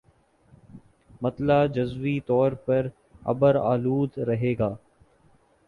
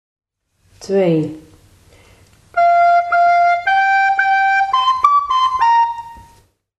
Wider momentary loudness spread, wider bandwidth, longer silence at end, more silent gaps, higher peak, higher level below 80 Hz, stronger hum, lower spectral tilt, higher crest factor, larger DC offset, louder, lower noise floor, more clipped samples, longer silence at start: about the same, 10 LU vs 8 LU; second, 4.9 kHz vs 9.2 kHz; first, 0.9 s vs 0.6 s; neither; second, -8 dBFS vs 0 dBFS; about the same, -54 dBFS vs -54 dBFS; neither; first, -9.5 dB/octave vs -5 dB/octave; about the same, 18 dB vs 16 dB; neither; second, -25 LUFS vs -14 LUFS; about the same, -61 dBFS vs -60 dBFS; neither; about the same, 0.75 s vs 0.8 s